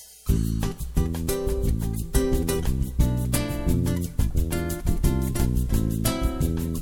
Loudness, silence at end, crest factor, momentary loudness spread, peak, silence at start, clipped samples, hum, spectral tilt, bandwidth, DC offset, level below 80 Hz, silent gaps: -26 LUFS; 0 s; 16 dB; 3 LU; -6 dBFS; 0 s; under 0.1%; none; -6 dB/octave; 17.5 kHz; under 0.1%; -28 dBFS; none